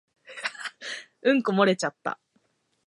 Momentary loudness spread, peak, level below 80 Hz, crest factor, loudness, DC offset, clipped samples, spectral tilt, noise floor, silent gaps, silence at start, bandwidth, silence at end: 14 LU; -6 dBFS; -82 dBFS; 22 dB; -27 LUFS; under 0.1%; under 0.1%; -5 dB/octave; -70 dBFS; none; 0.3 s; 11.5 kHz; 0.75 s